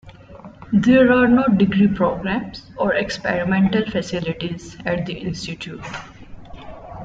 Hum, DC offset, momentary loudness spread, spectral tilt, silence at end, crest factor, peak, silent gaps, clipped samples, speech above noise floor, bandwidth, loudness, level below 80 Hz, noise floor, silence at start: none; under 0.1%; 19 LU; -6.5 dB/octave; 0 s; 18 dB; -2 dBFS; none; under 0.1%; 22 dB; 7.8 kHz; -19 LUFS; -44 dBFS; -41 dBFS; 0.05 s